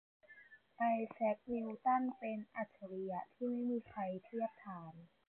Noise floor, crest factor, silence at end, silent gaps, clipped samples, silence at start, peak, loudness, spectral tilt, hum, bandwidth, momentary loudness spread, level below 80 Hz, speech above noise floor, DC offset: -63 dBFS; 16 dB; 0.25 s; none; under 0.1%; 0.3 s; -26 dBFS; -41 LUFS; -6.5 dB/octave; none; 4.1 kHz; 15 LU; -80 dBFS; 22 dB; under 0.1%